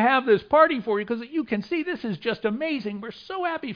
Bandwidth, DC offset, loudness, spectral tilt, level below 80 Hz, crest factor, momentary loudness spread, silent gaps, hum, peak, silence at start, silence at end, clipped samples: 5.2 kHz; under 0.1%; -24 LUFS; -7.5 dB/octave; -62 dBFS; 20 dB; 11 LU; none; none; -4 dBFS; 0 s; 0 s; under 0.1%